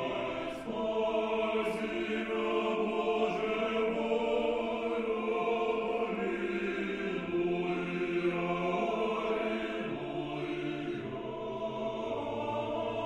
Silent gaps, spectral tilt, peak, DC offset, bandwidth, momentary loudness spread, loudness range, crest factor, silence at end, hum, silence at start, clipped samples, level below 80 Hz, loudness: none; -6.5 dB/octave; -18 dBFS; under 0.1%; 11 kHz; 6 LU; 4 LU; 14 dB; 0 s; none; 0 s; under 0.1%; -60 dBFS; -33 LUFS